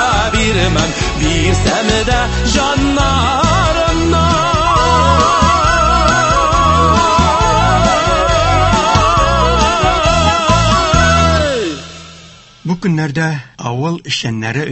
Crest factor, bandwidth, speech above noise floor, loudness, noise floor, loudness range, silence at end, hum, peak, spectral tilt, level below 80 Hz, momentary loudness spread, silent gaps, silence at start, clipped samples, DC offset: 12 dB; 8.6 kHz; 23 dB; -12 LUFS; -38 dBFS; 4 LU; 0 s; none; 0 dBFS; -4.5 dB/octave; -20 dBFS; 8 LU; none; 0 s; under 0.1%; under 0.1%